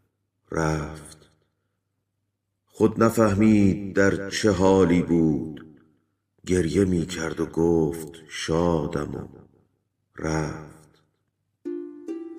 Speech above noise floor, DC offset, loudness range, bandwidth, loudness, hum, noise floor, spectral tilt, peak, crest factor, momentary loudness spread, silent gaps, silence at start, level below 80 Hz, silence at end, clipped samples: 55 dB; under 0.1%; 9 LU; 15.5 kHz; -23 LUFS; none; -78 dBFS; -6.5 dB/octave; -4 dBFS; 20 dB; 18 LU; none; 0.5 s; -46 dBFS; 0 s; under 0.1%